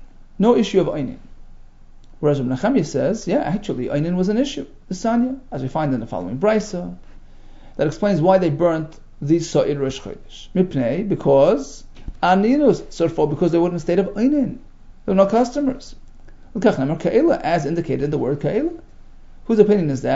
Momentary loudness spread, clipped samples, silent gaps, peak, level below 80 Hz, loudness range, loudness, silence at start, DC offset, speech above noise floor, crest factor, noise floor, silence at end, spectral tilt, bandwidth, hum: 15 LU; under 0.1%; none; 0 dBFS; -40 dBFS; 4 LU; -19 LUFS; 0 s; under 0.1%; 23 dB; 20 dB; -41 dBFS; 0 s; -7 dB/octave; 7.8 kHz; none